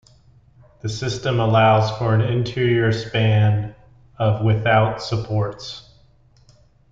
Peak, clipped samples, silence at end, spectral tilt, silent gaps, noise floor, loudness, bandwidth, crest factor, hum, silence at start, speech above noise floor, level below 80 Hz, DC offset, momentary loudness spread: -4 dBFS; under 0.1%; 1.1 s; -6.5 dB/octave; none; -53 dBFS; -19 LUFS; 7.6 kHz; 16 dB; none; 0.85 s; 35 dB; -48 dBFS; under 0.1%; 14 LU